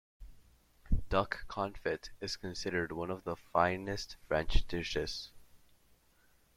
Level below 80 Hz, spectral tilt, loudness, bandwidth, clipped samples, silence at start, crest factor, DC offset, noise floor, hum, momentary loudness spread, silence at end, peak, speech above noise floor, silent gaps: -42 dBFS; -5 dB/octave; -36 LUFS; 13.5 kHz; under 0.1%; 0.2 s; 22 dB; under 0.1%; -68 dBFS; none; 9 LU; 1 s; -14 dBFS; 33 dB; none